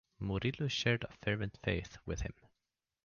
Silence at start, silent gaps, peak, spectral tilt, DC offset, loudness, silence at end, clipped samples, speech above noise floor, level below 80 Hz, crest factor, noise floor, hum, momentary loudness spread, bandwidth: 0.2 s; none; -20 dBFS; -5.5 dB/octave; under 0.1%; -37 LUFS; 0.75 s; under 0.1%; 52 dB; -52 dBFS; 18 dB; -89 dBFS; none; 9 LU; 7.2 kHz